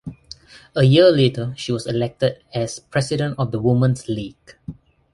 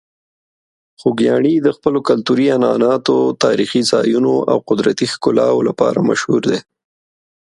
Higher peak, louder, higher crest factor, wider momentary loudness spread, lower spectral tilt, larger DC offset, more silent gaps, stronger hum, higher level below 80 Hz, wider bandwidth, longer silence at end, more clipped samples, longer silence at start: about the same, -2 dBFS vs 0 dBFS; second, -19 LUFS vs -15 LUFS; about the same, 18 dB vs 16 dB; first, 25 LU vs 3 LU; about the same, -6.5 dB/octave vs -5.5 dB/octave; neither; neither; neither; first, -50 dBFS vs -58 dBFS; about the same, 11.5 kHz vs 11.5 kHz; second, 0.4 s vs 0.95 s; neither; second, 0.05 s vs 1 s